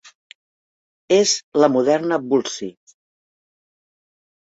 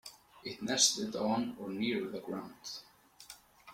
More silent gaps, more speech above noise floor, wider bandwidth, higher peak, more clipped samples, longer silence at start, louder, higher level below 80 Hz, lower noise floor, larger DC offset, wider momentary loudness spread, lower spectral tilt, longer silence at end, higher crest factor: first, 0.15-1.08 s, 1.43-1.52 s vs none; first, over 72 dB vs 21 dB; second, 8 kHz vs 16.5 kHz; first, -2 dBFS vs -12 dBFS; neither; about the same, 0.05 s vs 0.05 s; first, -18 LUFS vs -33 LUFS; first, -68 dBFS vs -74 dBFS; first, under -90 dBFS vs -56 dBFS; neither; second, 13 LU vs 25 LU; first, -3.5 dB/octave vs -2 dB/octave; first, 1.8 s vs 0 s; about the same, 20 dB vs 24 dB